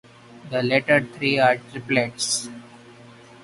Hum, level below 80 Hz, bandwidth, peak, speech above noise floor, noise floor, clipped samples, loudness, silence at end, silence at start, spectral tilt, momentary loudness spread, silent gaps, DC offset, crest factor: none; -62 dBFS; 11.5 kHz; -2 dBFS; 25 dB; -46 dBFS; under 0.1%; -21 LUFS; 0.55 s; 0.35 s; -3.5 dB/octave; 10 LU; none; under 0.1%; 20 dB